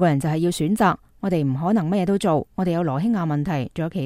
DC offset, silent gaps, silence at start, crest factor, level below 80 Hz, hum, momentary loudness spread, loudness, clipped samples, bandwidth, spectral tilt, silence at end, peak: under 0.1%; none; 0 s; 16 dB; -50 dBFS; none; 5 LU; -22 LUFS; under 0.1%; 15.5 kHz; -7 dB/octave; 0 s; -4 dBFS